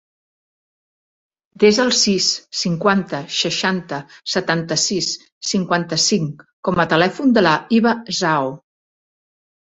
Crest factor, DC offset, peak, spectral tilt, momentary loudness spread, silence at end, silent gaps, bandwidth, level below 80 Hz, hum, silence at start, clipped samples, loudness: 18 dB; under 0.1%; 0 dBFS; -3.5 dB/octave; 9 LU; 1.15 s; 5.32-5.41 s, 6.53-6.63 s; 8.2 kHz; -58 dBFS; none; 1.6 s; under 0.1%; -18 LUFS